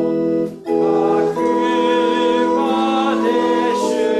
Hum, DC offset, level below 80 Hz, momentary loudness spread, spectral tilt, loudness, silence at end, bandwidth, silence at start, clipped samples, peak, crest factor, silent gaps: none; under 0.1%; -58 dBFS; 3 LU; -5.5 dB/octave; -17 LUFS; 0 s; 12.5 kHz; 0 s; under 0.1%; -6 dBFS; 10 dB; none